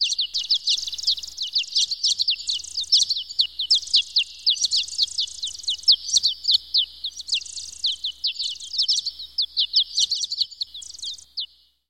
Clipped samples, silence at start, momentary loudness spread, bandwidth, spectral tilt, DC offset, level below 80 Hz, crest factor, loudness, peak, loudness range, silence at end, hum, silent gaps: under 0.1%; 0 s; 12 LU; 16.5 kHz; 4.5 dB/octave; 0.2%; -62 dBFS; 18 dB; -21 LUFS; -6 dBFS; 3 LU; 0.45 s; none; none